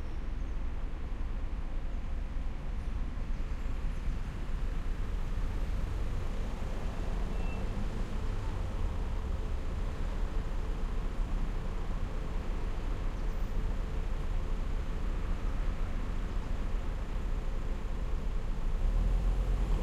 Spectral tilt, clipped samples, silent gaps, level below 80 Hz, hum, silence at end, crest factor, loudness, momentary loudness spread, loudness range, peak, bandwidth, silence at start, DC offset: -7 dB/octave; under 0.1%; none; -32 dBFS; none; 0 s; 12 dB; -39 LUFS; 3 LU; 2 LU; -20 dBFS; 8.2 kHz; 0 s; under 0.1%